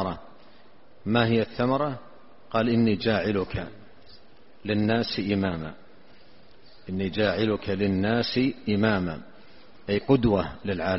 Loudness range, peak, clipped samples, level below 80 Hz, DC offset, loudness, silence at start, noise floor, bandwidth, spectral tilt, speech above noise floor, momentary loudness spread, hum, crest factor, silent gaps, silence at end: 4 LU; -6 dBFS; under 0.1%; -50 dBFS; 0.5%; -26 LUFS; 0 s; -56 dBFS; 6 kHz; -5 dB/octave; 31 dB; 15 LU; none; 20 dB; none; 0 s